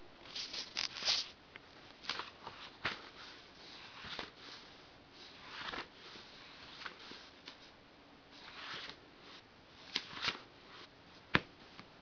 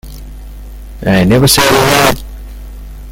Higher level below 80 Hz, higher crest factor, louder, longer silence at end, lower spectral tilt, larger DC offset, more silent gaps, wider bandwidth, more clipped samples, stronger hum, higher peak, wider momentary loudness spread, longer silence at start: second, -70 dBFS vs -26 dBFS; first, 36 dB vs 12 dB; second, -41 LUFS vs -9 LUFS; about the same, 0 s vs 0 s; second, -0.5 dB/octave vs -4 dB/octave; neither; neither; second, 5.4 kHz vs over 20 kHz; second, under 0.1% vs 0.2%; second, none vs 50 Hz at -30 dBFS; second, -10 dBFS vs 0 dBFS; second, 20 LU vs 25 LU; about the same, 0 s vs 0.05 s